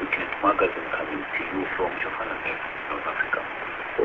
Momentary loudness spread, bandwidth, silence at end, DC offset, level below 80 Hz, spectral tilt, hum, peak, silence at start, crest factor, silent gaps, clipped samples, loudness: 7 LU; 7.2 kHz; 0 s; under 0.1%; -54 dBFS; -6.5 dB/octave; none; -8 dBFS; 0 s; 20 dB; none; under 0.1%; -27 LUFS